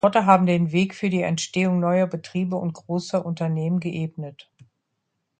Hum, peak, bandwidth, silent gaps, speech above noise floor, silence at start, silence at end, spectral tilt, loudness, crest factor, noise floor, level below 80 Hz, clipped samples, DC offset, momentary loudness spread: none; -2 dBFS; 9.2 kHz; none; 55 dB; 0.05 s; 1.1 s; -6.5 dB/octave; -23 LUFS; 22 dB; -77 dBFS; -64 dBFS; under 0.1%; under 0.1%; 12 LU